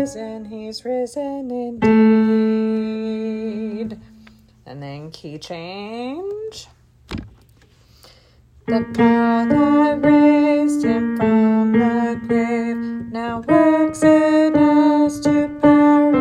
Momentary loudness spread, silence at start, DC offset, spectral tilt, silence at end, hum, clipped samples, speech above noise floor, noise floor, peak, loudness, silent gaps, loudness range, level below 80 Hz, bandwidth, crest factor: 19 LU; 0 s; under 0.1%; -7 dB/octave; 0 s; none; under 0.1%; 34 dB; -51 dBFS; 0 dBFS; -17 LUFS; none; 16 LU; -50 dBFS; 11 kHz; 16 dB